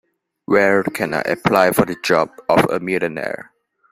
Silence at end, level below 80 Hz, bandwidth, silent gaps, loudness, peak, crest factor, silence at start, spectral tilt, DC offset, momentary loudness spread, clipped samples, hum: 0.5 s; -54 dBFS; 16 kHz; none; -18 LUFS; 0 dBFS; 18 dB; 0.5 s; -5.5 dB/octave; under 0.1%; 8 LU; under 0.1%; none